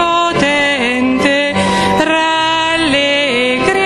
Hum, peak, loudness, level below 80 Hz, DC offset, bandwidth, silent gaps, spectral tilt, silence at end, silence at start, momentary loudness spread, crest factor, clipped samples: none; -2 dBFS; -12 LUFS; -40 dBFS; under 0.1%; 12.5 kHz; none; -3.5 dB/octave; 0 s; 0 s; 1 LU; 12 dB; under 0.1%